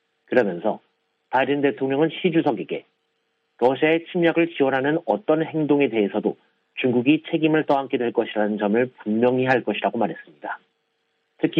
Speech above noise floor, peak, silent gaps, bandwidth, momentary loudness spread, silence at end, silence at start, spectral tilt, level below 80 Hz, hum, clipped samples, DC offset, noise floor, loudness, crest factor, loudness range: 51 dB; -4 dBFS; none; 5.6 kHz; 10 LU; 0 s; 0.3 s; -8.5 dB/octave; -70 dBFS; none; under 0.1%; under 0.1%; -72 dBFS; -22 LUFS; 18 dB; 2 LU